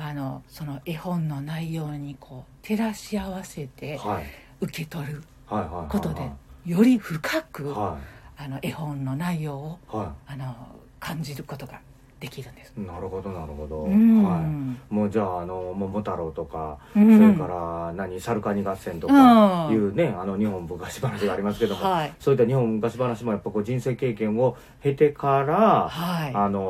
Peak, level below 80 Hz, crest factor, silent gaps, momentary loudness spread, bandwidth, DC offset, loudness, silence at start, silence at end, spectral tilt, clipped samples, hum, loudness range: -4 dBFS; -50 dBFS; 20 dB; none; 18 LU; 14.5 kHz; under 0.1%; -24 LUFS; 0 s; 0 s; -7.5 dB/octave; under 0.1%; none; 12 LU